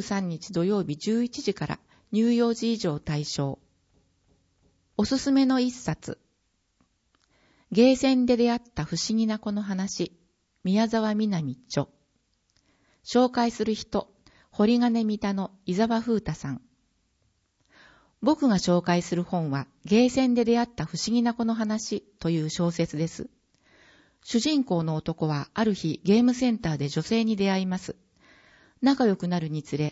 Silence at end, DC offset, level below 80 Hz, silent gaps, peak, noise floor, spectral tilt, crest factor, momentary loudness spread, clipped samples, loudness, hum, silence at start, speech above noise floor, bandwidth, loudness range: 0 s; under 0.1%; -58 dBFS; none; -8 dBFS; -73 dBFS; -6 dB/octave; 18 dB; 11 LU; under 0.1%; -26 LUFS; none; 0 s; 48 dB; 8 kHz; 4 LU